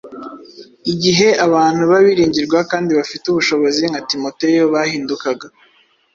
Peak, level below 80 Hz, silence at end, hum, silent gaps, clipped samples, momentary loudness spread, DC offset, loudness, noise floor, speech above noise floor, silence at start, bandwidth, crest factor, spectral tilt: 0 dBFS; -54 dBFS; 0.65 s; none; none; under 0.1%; 11 LU; under 0.1%; -15 LUFS; -39 dBFS; 25 dB; 0.05 s; 7.6 kHz; 16 dB; -4.5 dB/octave